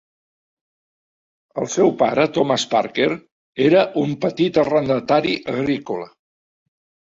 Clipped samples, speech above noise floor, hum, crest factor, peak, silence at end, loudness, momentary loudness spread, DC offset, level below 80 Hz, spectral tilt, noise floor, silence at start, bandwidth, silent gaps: under 0.1%; over 72 dB; none; 18 dB; -2 dBFS; 1.05 s; -19 LUFS; 13 LU; under 0.1%; -60 dBFS; -5 dB/octave; under -90 dBFS; 1.55 s; 7.8 kHz; 3.32-3.53 s